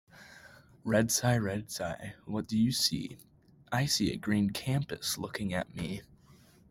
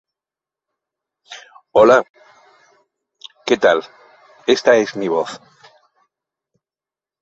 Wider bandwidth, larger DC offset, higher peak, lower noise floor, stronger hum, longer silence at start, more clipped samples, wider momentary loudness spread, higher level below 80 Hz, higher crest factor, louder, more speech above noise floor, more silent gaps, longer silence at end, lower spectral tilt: first, 16.5 kHz vs 8 kHz; neither; second, -14 dBFS vs 0 dBFS; second, -60 dBFS vs under -90 dBFS; neither; second, 0.15 s vs 1.3 s; neither; second, 14 LU vs 26 LU; about the same, -60 dBFS vs -60 dBFS; about the same, 20 dB vs 20 dB; second, -31 LUFS vs -16 LUFS; second, 28 dB vs over 76 dB; second, none vs 2.10-2.14 s; second, 0.65 s vs 1.85 s; about the same, -4.5 dB/octave vs -4 dB/octave